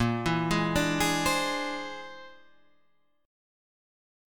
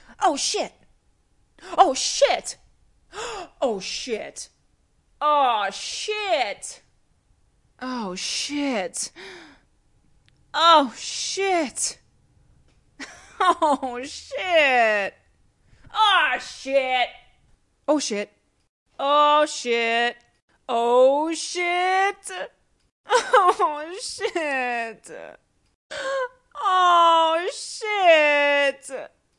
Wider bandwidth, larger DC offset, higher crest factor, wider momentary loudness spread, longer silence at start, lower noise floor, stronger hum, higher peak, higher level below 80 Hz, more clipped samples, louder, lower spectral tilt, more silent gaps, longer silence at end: first, 19 kHz vs 11.5 kHz; first, 0.3% vs under 0.1%; about the same, 18 dB vs 22 dB; about the same, 16 LU vs 18 LU; about the same, 0 s vs 0.1 s; first, -71 dBFS vs -64 dBFS; neither; second, -12 dBFS vs -2 dBFS; first, -50 dBFS vs -62 dBFS; neither; second, -27 LUFS vs -21 LUFS; first, -4 dB/octave vs -1 dB/octave; second, none vs 18.69-18.86 s, 20.42-20.48 s, 22.92-23.04 s, 25.75-25.90 s; first, 1 s vs 0.3 s